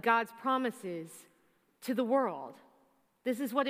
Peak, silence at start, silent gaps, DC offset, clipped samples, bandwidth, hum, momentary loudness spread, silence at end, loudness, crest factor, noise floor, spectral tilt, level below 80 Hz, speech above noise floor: -14 dBFS; 0.05 s; none; under 0.1%; under 0.1%; 16 kHz; none; 17 LU; 0 s; -34 LUFS; 20 dB; -71 dBFS; -4.5 dB/octave; under -90 dBFS; 38 dB